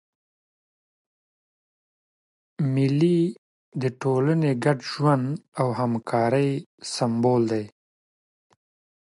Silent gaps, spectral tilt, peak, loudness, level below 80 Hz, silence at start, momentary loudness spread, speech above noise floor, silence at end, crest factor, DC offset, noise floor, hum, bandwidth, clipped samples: 3.38-3.72 s, 5.48-5.52 s, 6.66-6.78 s; -7 dB/octave; -8 dBFS; -24 LUFS; -68 dBFS; 2.6 s; 9 LU; over 67 dB; 1.35 s; 18 dB; under 0.1%; under -90 dBFS; none; 11.5 kHz; under 0.1%